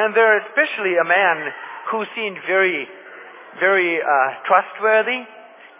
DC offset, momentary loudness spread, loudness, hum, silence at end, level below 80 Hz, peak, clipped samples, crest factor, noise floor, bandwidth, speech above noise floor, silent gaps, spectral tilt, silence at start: under 0.1%; 15 LU; -18 LUFS; none; 0.35 s; under -90 dBFS; -2 dBFS; under 0.1%; 18 dB; -40 dBFS; 3.9 kHz; 21 dB; none; -7 dB/octave; 0 s